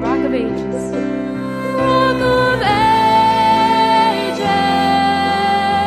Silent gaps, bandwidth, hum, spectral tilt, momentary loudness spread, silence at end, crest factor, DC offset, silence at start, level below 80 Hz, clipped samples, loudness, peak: none; 14 kHz; none; -5.5 dB/octave; 9 LU; 0 s; 12 dB; under 0.1%; 0 s; -40 dBFS; under 0.1%; -15 LUFS; -2 dBFS